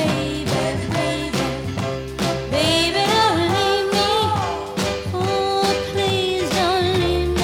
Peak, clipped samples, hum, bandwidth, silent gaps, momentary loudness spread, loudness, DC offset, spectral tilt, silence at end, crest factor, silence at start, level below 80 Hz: -6 dBFS; under 0.1%; none; 17.5 kHz; none; 7 LU; -20 LUFS; under 0.1%; -4.5 dB/octave; 0 s; 14 dB; 0 s; -38 dBFS